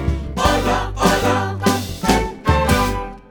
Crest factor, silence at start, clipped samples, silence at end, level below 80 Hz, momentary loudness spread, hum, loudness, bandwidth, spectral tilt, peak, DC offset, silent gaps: 16 dB; 0 s; under 0.1%; 0.1 s; -26 dBFS; 5 LU; none; -18 LUFS; over 20 kHz; -5 dB/octave; -2 dBFS; under 0.1%; none